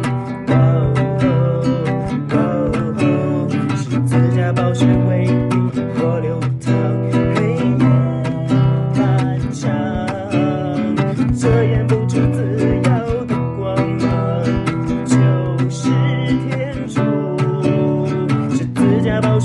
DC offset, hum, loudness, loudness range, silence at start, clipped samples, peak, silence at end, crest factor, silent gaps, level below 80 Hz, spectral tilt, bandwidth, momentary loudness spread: under 0.1%; none; -17 LUFS; 1 LU; 0 s; under 0.1%; -4 dBFS; 0 s; 12 dB; none; -38 dBFS; -8 dB/octave; 11 kHz; 5 LU